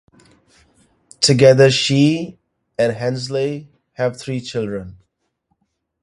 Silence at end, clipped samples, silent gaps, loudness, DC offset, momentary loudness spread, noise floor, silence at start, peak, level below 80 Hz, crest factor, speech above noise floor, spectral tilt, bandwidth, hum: 1.1 s; under 0.1%; none; -16 LUFS; under 0.1%; 17 LU; -70 dBFS; 1.2 s; 0 dBFS; -54 dBFS; 18 dB; 53 dB; -5 dB/octave; 11.5 kHz; none